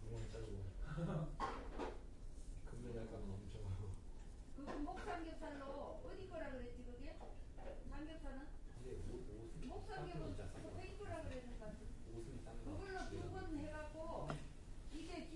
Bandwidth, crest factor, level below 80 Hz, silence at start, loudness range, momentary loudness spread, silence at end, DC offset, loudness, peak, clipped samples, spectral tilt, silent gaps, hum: 11.5 kHz; 20 dB; -52 dBFS; 0 s; 4 LU; 9 LU; 0 s; under 0.1%; -51 LUFS; -28 dBFS; under 0.1%; -6.5 dB/octave; none; none